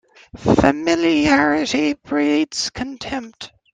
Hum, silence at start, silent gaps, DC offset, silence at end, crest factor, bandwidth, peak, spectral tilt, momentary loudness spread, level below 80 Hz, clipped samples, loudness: none; 0.35 s; none; under 0.1%; 0.25 s; 18 dB; 9.4 kHz; 0 dBFS; -4.5 dB/octave; 13 LU; -42 dBFS; under 0.1%; -18 LUFS